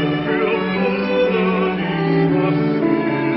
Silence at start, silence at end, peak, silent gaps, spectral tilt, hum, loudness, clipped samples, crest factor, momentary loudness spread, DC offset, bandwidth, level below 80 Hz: 0 s; 0 s; -4 dBFS; none; -12 dB/octave; none; -18 LUFS; under 0.1%; 12 dB; 2 LU; under 0.1%; 5.8 kHz; -50 dBFS